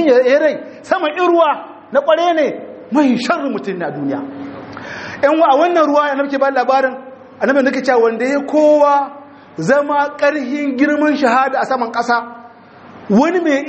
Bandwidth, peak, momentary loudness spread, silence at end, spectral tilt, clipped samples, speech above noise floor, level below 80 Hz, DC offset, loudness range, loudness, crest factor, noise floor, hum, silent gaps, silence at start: 8.4 kHz; 0 dBFS; 14 LU; 0 s; -5.5 dB/octave; under 0.1%; 25 dB; -62 dBFS; under 0.1%; 3 LU; -14 LUFS; 14 dB; -39 dBFS; none; none; 0 s